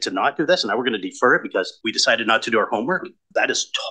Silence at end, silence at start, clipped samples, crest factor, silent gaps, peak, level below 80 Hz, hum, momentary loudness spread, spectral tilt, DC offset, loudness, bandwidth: 0 s; 0 s; under 0.1%; 18 dB; none; -2 dBFS; -72 dBFS; none; 7 LU; -2.5 dB/octave; under 0.1%; -20 LUFS; 10 kHz